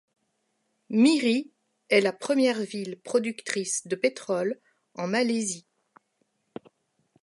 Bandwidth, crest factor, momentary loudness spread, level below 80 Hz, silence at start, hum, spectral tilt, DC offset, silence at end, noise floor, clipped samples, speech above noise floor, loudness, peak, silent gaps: 11.5 kHz; 20 dB; 22 LU; -82 dBFS; 0.9 s; none; -3.5 dB/octave; under 0.1%; 1.65 s; -75 dBFS; under 0.1%; 50 dB; -26 LUFS; -8 dBFS; none